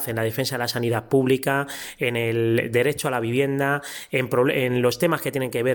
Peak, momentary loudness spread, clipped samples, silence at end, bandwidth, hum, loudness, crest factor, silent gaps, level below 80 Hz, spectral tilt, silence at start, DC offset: -6 dBFS; 5 LU; under 0.1%; 0 s; 17.5 kHz; none; -23 LUFS; 16 dB; none; -60 dBFS; -5.5 dB/octave; 0 s; under 0.1%